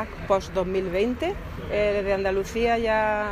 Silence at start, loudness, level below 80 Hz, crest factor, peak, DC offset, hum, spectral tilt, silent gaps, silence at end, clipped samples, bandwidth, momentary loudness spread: 0 s; -25 LUFS; -40 dBFS; 16 dB; -8 dBFS; under 0.1%; none; -5.5 dB/octave; none; 0 s; under 0.1%; 15.5 kHz; 7 LU